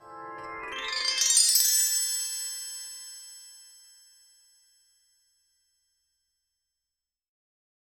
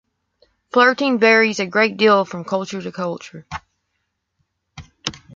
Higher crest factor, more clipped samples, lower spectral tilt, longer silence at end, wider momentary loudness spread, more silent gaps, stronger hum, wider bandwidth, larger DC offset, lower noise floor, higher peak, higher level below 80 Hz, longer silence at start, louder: first, 28 dB vs 18 dB; neither; second, 3.5 dB/octave vs -4.5 dB/octave; first, 4.3 s vs 0.2 s; first, 23 LU vs 19 LU; neither; neither; first, over 20 kHz vs 7.6 kHz; neither; first, -89 dBFS vs -74 dBFS; about the same, -4 dBFS vs -2 dBFS; second, -72 dBFS vs -56 dBFS; second, 0 s vs 0.75 s; second, -23 LUFS vs -17 LUFS